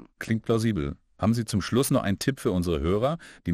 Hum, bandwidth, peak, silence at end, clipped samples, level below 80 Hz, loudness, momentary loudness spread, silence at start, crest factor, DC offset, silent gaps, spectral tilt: none; 14 kHz; -10 dBFS; 0 s; under 0.1%; -44 dBFS; -26 LUFS; 6 LU; 0 s; 16 dB; under 0.1%; none; -6 dB/octave